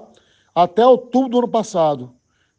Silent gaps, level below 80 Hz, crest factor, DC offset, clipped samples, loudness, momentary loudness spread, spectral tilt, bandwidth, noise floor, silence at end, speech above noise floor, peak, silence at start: none; -66 dBFS; 18 dB; under 0.1%; under 0.1%; -17 LUFS; 8 LU; -6 dB/octave; 9 kHz; -54 dBFS; 0.5 s; 38 dB; 0 dBFS; 0.55 s